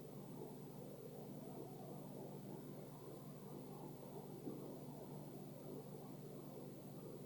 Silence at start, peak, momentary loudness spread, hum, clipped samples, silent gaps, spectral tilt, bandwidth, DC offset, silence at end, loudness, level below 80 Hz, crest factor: 0 s; -38 dBFS; 2 LU; none; under 0.1%; none; -7 dB/octave; 19 kHz; under 0.1%; 0 s; -53 LUFS; -84 dBFS; 16 dB